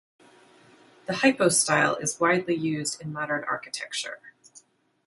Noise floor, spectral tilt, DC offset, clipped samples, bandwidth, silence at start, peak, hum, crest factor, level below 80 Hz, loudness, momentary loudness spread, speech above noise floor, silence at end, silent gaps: -57 dBFS; -3 dB/octave; under 0.1%; under 0.1%; 12 kHz; 1.1 s; -6 dBFS; none; 22 dB; -70 dBFS; -25 LUFS; 13 LU; 32 dB; 0.75 s; none